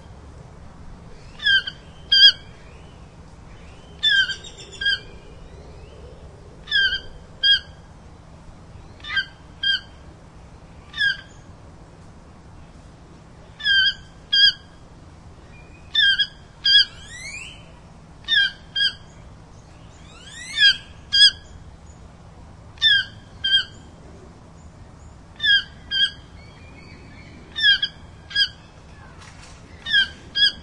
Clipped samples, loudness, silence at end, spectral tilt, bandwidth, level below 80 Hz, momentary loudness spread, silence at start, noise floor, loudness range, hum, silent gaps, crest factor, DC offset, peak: under 0.1%; -18 LUFS; 0 s; -0.5 dB/octave; 11.5 kHz; -48 dBFS; 21 LU; 0.1 s; -45 dBFS; 8 LU; none; none; 24 dB; under 0.1%; -2 dBFS